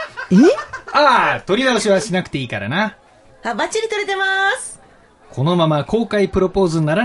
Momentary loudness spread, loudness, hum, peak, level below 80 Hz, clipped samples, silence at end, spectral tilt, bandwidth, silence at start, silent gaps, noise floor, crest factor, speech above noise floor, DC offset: 11 LU; -17 LUFS; none; 0 dBFS; -44 dBFS; under 0.1%; 0 s; -5 dB/octave; 11.5 kHz; 0 s; none; -48 dBFS; 16 dB; 32 dB; under 0.1%